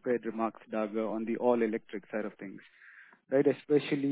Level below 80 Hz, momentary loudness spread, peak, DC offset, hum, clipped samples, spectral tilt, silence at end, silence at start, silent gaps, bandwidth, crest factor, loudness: -82 dBFS; 12 LU; -14 dBFS; under 0.1%; none; under 0.1%; -10 dB/octave; 0 s; 0.05 s; none; 4 kHz; 18 dB; -32 LUFS